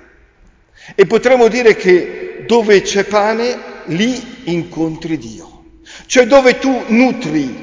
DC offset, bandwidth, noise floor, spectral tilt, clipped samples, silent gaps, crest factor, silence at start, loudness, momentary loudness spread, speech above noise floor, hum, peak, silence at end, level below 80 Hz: under 0.1%; 7.6 kHz; -49 dBFS; -4.5 dB/octave; under 0.1%; none; 14 dB; 0.85 s; -13 LUFS; 14 LU; 36 dB; none; 0 dBFS; 0 s; -46 dBFS